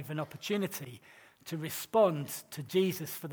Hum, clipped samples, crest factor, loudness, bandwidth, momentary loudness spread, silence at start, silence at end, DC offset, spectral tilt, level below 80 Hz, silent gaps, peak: none; under 0.1%; 18 dB; -33 LUFS; over 20 kHz; 16 LU; 0 s; 0 s; under 0.1%; -5 dB/octave; -78 dBFS; none; -14 dBFS